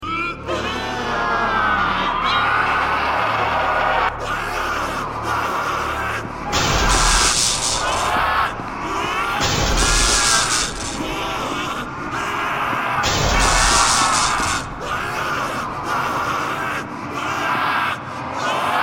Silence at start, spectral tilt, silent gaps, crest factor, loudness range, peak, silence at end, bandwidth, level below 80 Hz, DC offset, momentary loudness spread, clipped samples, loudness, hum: 0 s; -2 dB/octave; none; 18 dB; 4 LU; -2 dBFS; 0 s; 17 kHz; -30 dBFS; under 0.1%; 10 LU; under 0.1%; -19 LUFS; none